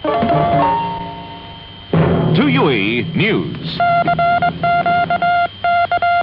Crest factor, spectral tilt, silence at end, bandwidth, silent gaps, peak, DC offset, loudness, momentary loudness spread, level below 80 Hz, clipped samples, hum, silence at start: 12 dB; -10 dB/octave; 0 s; 5.6 kHz; none; -2 dBFS; under 0.1%; -15 LUFS; 13 LU; -44 dBFS; under 0.1%; none; 0 s